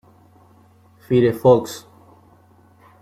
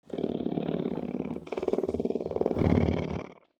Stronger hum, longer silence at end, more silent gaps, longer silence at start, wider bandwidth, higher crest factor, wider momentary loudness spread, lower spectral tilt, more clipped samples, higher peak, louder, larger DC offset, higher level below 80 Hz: neither; first, 1.25 s vs 0.25 s; neither; first, 1.1 s vs 0.1 s; first, 15.5 kHz vs 8.4 kHz; about the same, 20 dB vs 22 dB; first, 19 LU vs 10 LU; second, -7 dB/octave vs -9 dB/octave; neither; first, -2 dBFS vs -8 dBFS; first, -17 LUFS vs -30 LUFS; neither; second, -56 dBFS vs -46 dBFS